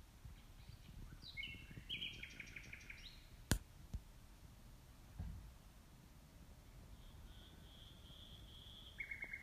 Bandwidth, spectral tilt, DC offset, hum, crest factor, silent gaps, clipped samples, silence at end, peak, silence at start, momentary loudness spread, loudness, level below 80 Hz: 15.5 kHz; -3.5 dB/octave; under 0.1%; none; 40 dB; none; under 0.1%; 0 s; -14 dBFS; 0 s; 17 LU; -52 LUFS; -58 dBFS